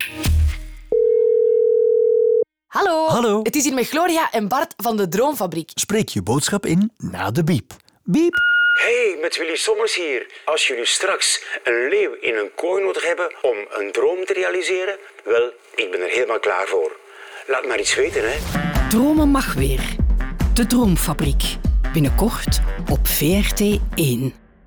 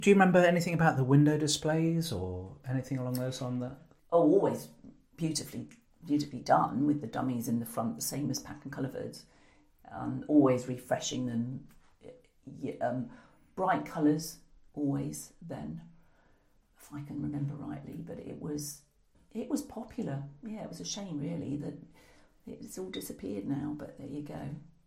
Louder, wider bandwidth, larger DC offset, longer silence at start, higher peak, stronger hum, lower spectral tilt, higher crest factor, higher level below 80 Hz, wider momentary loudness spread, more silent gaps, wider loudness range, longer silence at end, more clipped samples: first, -19 LUFS vs -32 LUFS; first, over 20 kHz vs 16 kHz; neither; about the same, 0 s vs 0 s; about the same, -8 dBFS vs -10 dBFS; neither; about the same, -4.5 dB/octave vs -5.5 dB/octave; second, 10 dB vs 22 dB; first, -28 dBFS vs -62 dBFS; second, 7 LU vs 19 LU; neither; second, 4 LU vs 10 LU; first, 0.35 s vs 0.2 s; neither